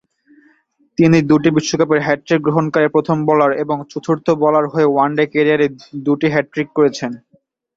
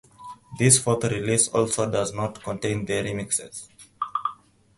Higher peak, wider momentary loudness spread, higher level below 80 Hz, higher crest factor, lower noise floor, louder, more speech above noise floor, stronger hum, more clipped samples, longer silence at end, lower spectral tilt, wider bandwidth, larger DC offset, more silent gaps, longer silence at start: about the same, 0 dBFS vs -2 dBFS; second, 8 LU vs 20 LU; about the same, -54 dBFS vs -54 dBFS; second, 16 dB vs 24 dB; first, -57 dBFS vs -45 dBFS; first, -15 LUFS vs -23 LUFS; first, 42 dB vs 21 dB; neither; neither; first, 0.6 s vs 0.45 s; first, -6.5 dB/octave vs -4 dB/octave; second, 7.8 kHz vs 12 kHz; neither; neither; first, 1 s vs 0.2 s